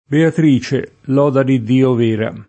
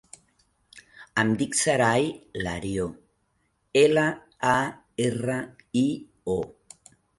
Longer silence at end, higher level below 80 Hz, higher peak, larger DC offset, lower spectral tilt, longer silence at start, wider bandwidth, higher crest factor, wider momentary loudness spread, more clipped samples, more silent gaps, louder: second, 0.05 s vs 0.7 s; about the same, -54 dBFS vs -54 dBFS; first, 0 dBFS vs -6 dBFS; neither; first, -8 dB/octave vs -4.5 dB/octave; second, 0.1 s vs 0.75 s; second, 8.6 kHz vs 11.5 kHz; second, 14 dB vs 20 dB; second, 6 LU vs 11 LU; neither; neither; first, -15 LUFS vs -25 LUFS